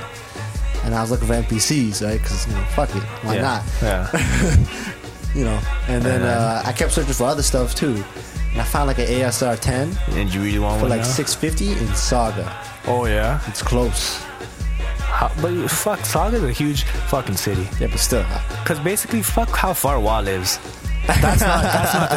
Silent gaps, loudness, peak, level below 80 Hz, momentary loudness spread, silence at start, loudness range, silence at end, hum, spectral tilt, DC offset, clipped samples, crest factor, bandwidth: none; -20 LUFS; 0 dBFS; -24 dBFS; 8 LU; 0 s; 2 LU; 0 s; none; -4.5 dB/octave; under 0.1%; under 0.1%; 18 dB; 16.5 kHz